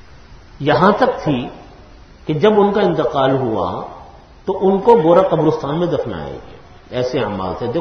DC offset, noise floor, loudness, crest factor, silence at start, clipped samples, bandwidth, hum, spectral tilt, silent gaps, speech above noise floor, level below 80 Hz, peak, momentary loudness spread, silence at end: under 0.1%; -41 dBFS; -16 LUFS; 16 dB; 0.3 s; under 0.1%; 6.6 kHz; none; -7.5 dB/octave; none; 25 dB; -44 dBFS; 0 dBFS; 16 LU; 0 s